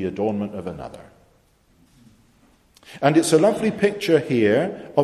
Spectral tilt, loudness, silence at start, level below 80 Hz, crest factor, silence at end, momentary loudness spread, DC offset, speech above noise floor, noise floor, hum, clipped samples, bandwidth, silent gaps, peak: -5.5 dB/octave; -20 LUFS; 0 s; -56 dBFS; 20 dB; 0 s; 16 LU; under 0.1%; 39 dB; -59 dBFS; none; under 0.1%; 13.5 kHz; none; -2 dBFS